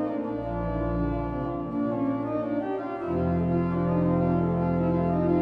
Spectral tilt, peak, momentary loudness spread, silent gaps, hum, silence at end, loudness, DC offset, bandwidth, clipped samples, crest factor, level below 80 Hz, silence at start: -11 dB/octave; -12 dBFS; 6 LU; none; none; 0 s; -27 LUFS; under 0.1%; 4.4 kHz; under 0.1%; 14 dB; -42 dBFS; 0 s